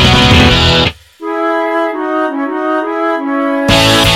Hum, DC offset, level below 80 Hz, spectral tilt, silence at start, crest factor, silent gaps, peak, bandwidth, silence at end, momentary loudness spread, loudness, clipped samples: none; under 0.1%; -24 dBFS; -4.5 dB/octave; 0 s; 10 dB; none; 0 dBFS; 17 kHz; 0 s; 10 LU; -11 LUFS; 0.2%